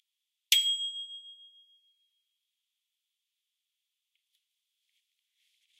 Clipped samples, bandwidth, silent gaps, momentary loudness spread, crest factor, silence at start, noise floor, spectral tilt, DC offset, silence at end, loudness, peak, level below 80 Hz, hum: under 0.1%; 15 kHz; none; 21 LU; 32 dB; 0.5 s; -86 dBFS; 11.5 dB/octave; under 0.1%; 4.35 s; -27 LUFS; -8 dBFS; under -90 dBFS; none